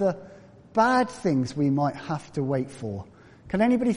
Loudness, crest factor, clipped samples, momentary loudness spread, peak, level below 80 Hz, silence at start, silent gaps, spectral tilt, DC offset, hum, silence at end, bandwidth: -26 LUFS; 18 dB; under 0.1%; 13 LU; -8 dBFS; -58 dBFS; 0 s; none; -7 dB/octave; under 0.1%; none; 0 s; 10.5 kHz